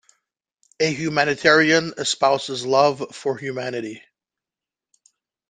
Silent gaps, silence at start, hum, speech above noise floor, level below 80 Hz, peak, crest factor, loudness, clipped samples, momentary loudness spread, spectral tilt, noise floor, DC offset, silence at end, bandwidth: none; 0.8 s; none; 69 dB; -66 dBFS; -2 dBFS; 20 dB; -20 LUFS; under 0.1%; 12 LU; -3.5 dB/octave; -89 dBFS; under 0.1%; 1.5 s; 9.8 kHz